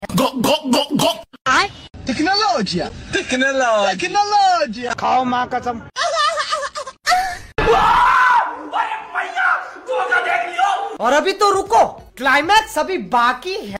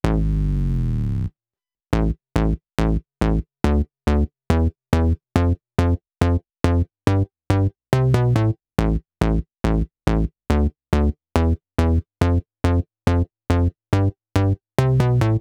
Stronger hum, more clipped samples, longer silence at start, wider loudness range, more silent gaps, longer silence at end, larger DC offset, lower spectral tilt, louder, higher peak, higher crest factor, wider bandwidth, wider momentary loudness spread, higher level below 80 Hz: neither; neither; about the same, 0 s vs 0.05 s; about the same, 2 LU vs 2 LU; first, 1.41-1.45 s vs none; about the same, 0 s vs 0 s; neither; second, -3 dB/octave vs -8 dB/octave; first, -17 LUFS vs -22 LUFS; second, -4 dBFS vs 0 dBFS; second, 14 dB vs 20 dB; first, 16 kHz vs 13.5 kHz; first, 10 LU vs 4 LU; second, -42 dBFS vs -26 dBFS